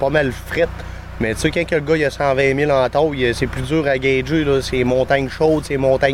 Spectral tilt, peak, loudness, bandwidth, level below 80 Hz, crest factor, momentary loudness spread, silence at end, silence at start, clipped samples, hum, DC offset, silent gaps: -6 dB/octave; -2 dBFS; -18 LUFS; 16 kHz; -34 dBFS; 14 dB; 6 LU; 0 s; 0 s; under 0.1%; none; 0.2%; none